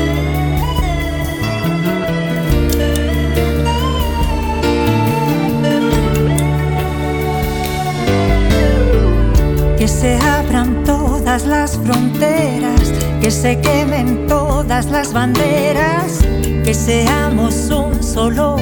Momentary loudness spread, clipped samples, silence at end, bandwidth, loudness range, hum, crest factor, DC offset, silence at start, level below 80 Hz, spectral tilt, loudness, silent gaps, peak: 4 LU; under 0.1%; 0 s; 19.5 kHz; 2 LU; none; 12 dB; under 0.1%; 0 s; -20 dBFS; -5.5 dB/octave; -15 LUFS; none; -2 dBFS